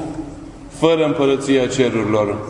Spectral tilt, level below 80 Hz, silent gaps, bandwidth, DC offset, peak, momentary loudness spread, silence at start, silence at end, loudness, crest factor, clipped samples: -5.5 dB/octave; -44 dBFS; none; 11 kHz; under 0.1%; 0 dBFS; 18 LU; 0 s; 0 s; -17 LUFS; 18 dB; under 0.1%